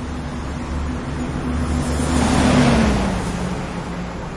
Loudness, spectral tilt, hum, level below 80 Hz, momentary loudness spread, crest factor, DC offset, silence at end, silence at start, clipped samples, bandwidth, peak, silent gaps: -20 LUFS; -5.5 dB/octave; none; -28 dBFS; 13 LU; 16 dB; under 0.1%; 0 s; 0 s; under 0.1%; 11.5 kHz; -4 dBFS; none